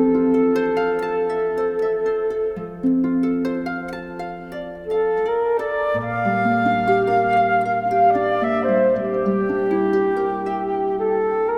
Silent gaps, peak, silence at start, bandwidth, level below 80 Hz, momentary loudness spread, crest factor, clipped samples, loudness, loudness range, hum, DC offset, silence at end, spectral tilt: none; -6 dBFS; 0 s; 8.8 kHz; -50 dBFS; 8 LU; 14 dB; under 0.1%; -20 LUFS; 5 LU; none; under 0.1%; 0 s; -8 dB/octave